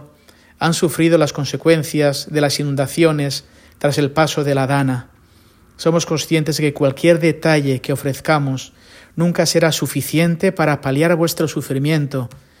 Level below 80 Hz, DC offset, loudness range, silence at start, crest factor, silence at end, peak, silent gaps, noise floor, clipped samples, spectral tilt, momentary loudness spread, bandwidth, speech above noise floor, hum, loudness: -52 dBFS; under 0.1%; 2 LU; 0 s; 16 dB; 0.2 s; 0 dBFS; none; -50 dBFS; under 0.1%; -5.5 dB/octave; 7 LU; 16.5 kHz; 33 dB; none; -17 LUFS